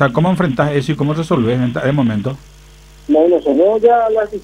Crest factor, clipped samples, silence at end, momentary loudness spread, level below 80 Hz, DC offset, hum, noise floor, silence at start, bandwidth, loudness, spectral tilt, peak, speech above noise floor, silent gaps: 14 dB; under 0.1%; 0 s; 7 LU; -44 dBFS; under 0.1%; none; -40 dBFS; 0 s; 11.5 kHz; -14 LUFS; -8 dB/octave; 0 dBFS; 27 dB; none